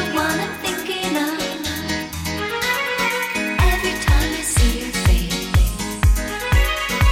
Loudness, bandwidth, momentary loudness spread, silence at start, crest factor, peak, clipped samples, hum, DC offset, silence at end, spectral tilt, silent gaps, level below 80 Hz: -20 LUFS; 17 kHz; 6 LU; 0 s; 14 dB; -4 dBFS; under 0.1%; none; under 0.1%; 0 s; -4 dB/octave; none; -22 dBFS